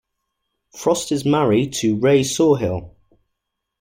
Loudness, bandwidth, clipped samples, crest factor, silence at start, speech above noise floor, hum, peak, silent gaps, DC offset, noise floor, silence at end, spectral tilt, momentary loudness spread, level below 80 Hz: -18 LUFS; 16.5 kHz; under 0.1%; 16 dB; 0.75 s; 61 dB; none; -4 dBFS; none; under 0.1%; -78 dBFS; 0.9 s; -5.5 dB/octave; 8 LU; -52 dBFS